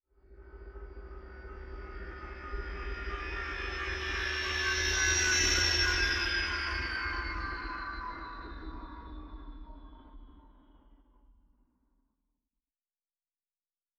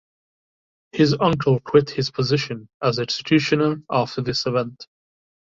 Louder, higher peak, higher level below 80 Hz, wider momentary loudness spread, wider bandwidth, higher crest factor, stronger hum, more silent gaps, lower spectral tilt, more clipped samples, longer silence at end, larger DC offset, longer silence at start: second, -31 LUFS vs -21 LUFS; second, -14 dBFS vs -2 dBFS; first, -44 dBFS vs -56 dBFS; first, 23 LU vs 7 LU; first, 14 kHz vs 7.6 kHz; about the same, 22 dB vs 20 dB; neither; second, none vs 2.74-2.80 s; second, -1.5 dB/octave vs -6 dB/octave; neither; first, 2.7 s vs 0.65 s; neither; second, 0.3 s vs 0.95 s